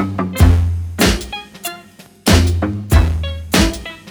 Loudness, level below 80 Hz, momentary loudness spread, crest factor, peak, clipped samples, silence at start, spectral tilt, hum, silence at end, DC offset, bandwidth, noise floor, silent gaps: -16 LUFS; -20 dBFS; 14 LU; 16 dB; 0 dBFS; under 0.1%; 0 s; -5 dB/octave; none; 0 s; under 0.1%; over 20 kHz; -41 dBFS; none